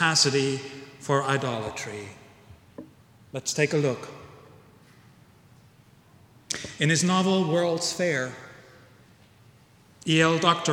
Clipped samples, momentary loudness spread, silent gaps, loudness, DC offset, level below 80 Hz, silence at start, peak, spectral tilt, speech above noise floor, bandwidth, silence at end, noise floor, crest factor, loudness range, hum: under 0.1%; 22 LU; none; -25 LUFS; under 0.1%; -66 dBFS; 0 s; -6 dBFS; -4 dB/octave; 32 dB; 16.5 kHz; 0 s; -56 dBFS; 22 dB; 5 LU; none